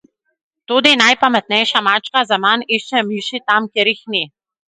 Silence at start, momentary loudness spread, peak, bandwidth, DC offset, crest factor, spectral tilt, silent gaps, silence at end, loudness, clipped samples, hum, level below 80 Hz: 0.7 s; 10 LU; 0 dBFS; 11.5 kHz; under 0.1%; 16 dB; -2.5 dB/octave; none; 0.5 s; -14 LUFS; under 0.1%; none; -66 dBFS